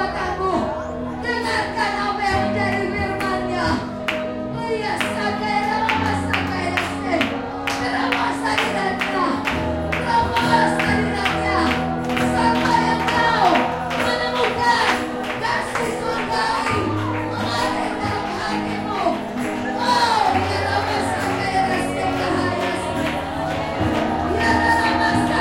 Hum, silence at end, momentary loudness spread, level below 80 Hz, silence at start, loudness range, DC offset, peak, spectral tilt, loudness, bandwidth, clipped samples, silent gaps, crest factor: none; 0 s; 7 LU; -40 dBFS; 0 s; 4 LU; under 0.1%; -4 dBFS; -5 dB/octave; -20 LUFS; 16.5 kHz; under 0.1%; none; 18 dB